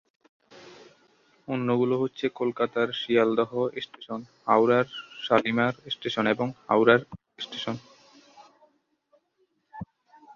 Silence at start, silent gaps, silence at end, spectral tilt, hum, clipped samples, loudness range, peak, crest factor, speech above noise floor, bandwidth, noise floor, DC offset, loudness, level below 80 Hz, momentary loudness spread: 0.55 s; none; 0.5 s; -6.5 dB/octave; none; under 0.1%; 5 LU; -4 dBFS; 24 dB; 46 dB; 7.2 kHz; -72 dBFS; under 0.1%; -26 LUFS; -68 dBFS; 18 LU